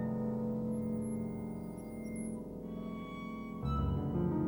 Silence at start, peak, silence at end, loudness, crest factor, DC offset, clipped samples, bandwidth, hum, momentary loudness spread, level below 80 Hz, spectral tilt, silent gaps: 0 s; -22 dBFS; 0 s; -39 LUFS; 14 dB; under 0.1%; under 0.1%; over 20 kHz; none; 9 LU; -48 dBFS; -8.5 dB/octave; none